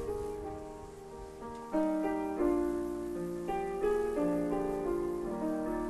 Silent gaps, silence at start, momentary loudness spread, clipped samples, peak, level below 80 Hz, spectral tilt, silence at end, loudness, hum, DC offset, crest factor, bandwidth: none; 0 s; 14 LU; under 0.1%; -18 dBFS; -52 dBFS; -7 dB/octave; 0 s; -34 LUFS; none; under 0.1%; 16 dB; 12.5 kHz